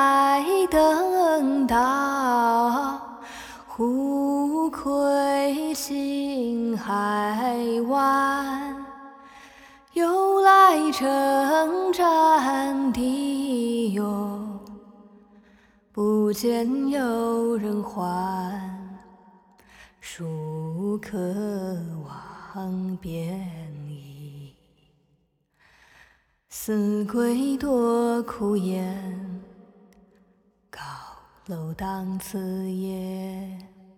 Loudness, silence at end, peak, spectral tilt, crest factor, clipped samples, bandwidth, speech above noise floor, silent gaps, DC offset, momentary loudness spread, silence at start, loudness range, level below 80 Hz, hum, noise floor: -24 LUFS; 0.3 s; -4 dBFS; -5.5 dB/octave; 20 dB; under 0.1%; 18.5 kHz; 44 dB; none; under 0.1%; 19 LU; 0 s; 14 LU; -56 dBFS; none; -68 dBFS